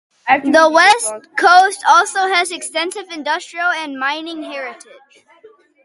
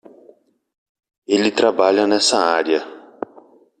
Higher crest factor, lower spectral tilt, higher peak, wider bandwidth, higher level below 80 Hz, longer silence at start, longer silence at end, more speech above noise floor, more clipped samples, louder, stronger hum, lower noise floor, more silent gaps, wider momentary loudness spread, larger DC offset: about the same, 16 dB vs 18 dB; second, -0.5 dB/octave vs -2.5 dB/octave; about the same, 0 dBFS vs -2 dBFS; about the same, 11.5 kHz vs 11.5 kHz; about the same, -66 dBFS vs -66 dBFS; second, 0.25 s vs 1.3 s; first, 1.1 s vs 0.8 s; second, 32 dB vs 36 dB; neither; first, -14 LUFS vs -17 LUFS; neither; second, -47 dBFS vs -52 dBFS; neither; second, 15 LU vs 19 LU; neither